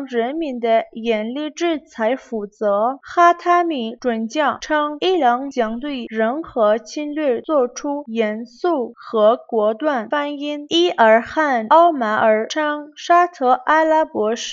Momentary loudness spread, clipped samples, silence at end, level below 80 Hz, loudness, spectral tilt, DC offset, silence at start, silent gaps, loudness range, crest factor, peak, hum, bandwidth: 9 LU; under 0.1%; 0 s; -60 dBFS; -18 LUFS; -4 dB/octave; under 0.1%; 0 s; none; 5 LU; 18 dB; 0 dBFS; none; 7.6 kHz